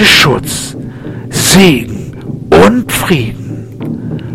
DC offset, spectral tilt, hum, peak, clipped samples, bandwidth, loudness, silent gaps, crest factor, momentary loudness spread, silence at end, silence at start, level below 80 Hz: under 0.1%; -4 dB/octave; none; 0 dBFS; 0.8%; over 20 kHz; -9 LUFS; none; 10 dB; 18 LU; 0 s; 0 s; -32 dBFS